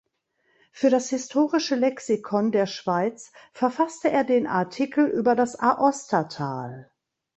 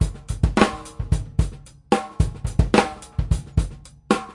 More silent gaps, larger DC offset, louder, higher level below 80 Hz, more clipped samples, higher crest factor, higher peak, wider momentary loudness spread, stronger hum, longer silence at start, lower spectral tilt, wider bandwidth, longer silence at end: neither; neither; about the same, -24 LUFS vs -23 LUFS; second, -68 dBFS vs -28 dBFS; neither; about the same, 18 dB vs 20 dB; second, -6 dBFS vs -2 dBFS; about the same, 8 LU vs 9 LU; neither; first, 0.75 s vs 0 s; about the same, -5 dB/octave vs -6 dB/octave; second, 8.2 kHz vs 11.5 kHz; first, 0.55 s vs 0 s